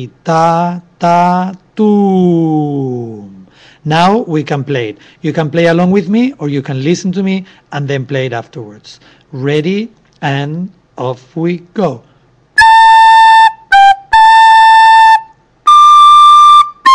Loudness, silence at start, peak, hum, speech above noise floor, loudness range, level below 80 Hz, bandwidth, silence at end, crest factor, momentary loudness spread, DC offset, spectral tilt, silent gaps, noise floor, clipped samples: -8 LUFS; 0 s; 0 dBFS; none; 26 dB; 13 LU; -48 dBFS; 11 kHz; 0 s; 8 dB; 17 LU; under 0.1%; -5.5 dB/octave; none; -38 dBFS; under 0.1%